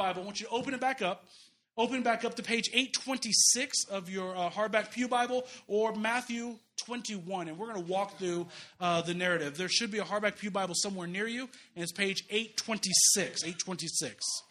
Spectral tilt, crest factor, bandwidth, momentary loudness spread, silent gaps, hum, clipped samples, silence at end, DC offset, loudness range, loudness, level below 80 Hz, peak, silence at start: -2 dB/octave; 24 dB; 15 kHz; 14 LU; none; none; under 0.1%; 0.1 s; under 0.1%; 6 LU; -31 LUFS; -78 dBFS; -10 dBFS; 0 s